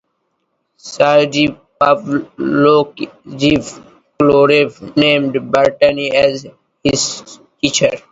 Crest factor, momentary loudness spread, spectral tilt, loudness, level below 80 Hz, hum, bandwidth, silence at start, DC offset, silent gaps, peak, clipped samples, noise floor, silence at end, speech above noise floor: 14 dB; 10 LU; -4 dB/octave; -14 LUFS; -48 dBFS; none; 8 kHz; 0.85 s; under 0.1%; none; 0 dBFS; under 0.1%; -68 dBFS; 0.15 s; 54 dB